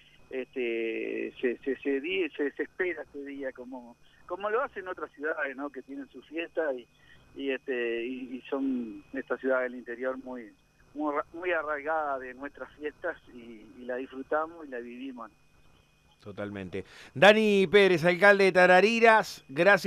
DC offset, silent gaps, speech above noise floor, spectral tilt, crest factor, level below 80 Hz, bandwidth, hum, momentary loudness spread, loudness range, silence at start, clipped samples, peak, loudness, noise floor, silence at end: under 0.1%; none; 34 dB; -5 dB/octave; 22 dB; -66 dBFS; 14 kHz; none; 22 LU; 15 LU; 0.3 s; under 0.1%; -8 dBFS; -27 LUFS; -63 dBFS; 0 s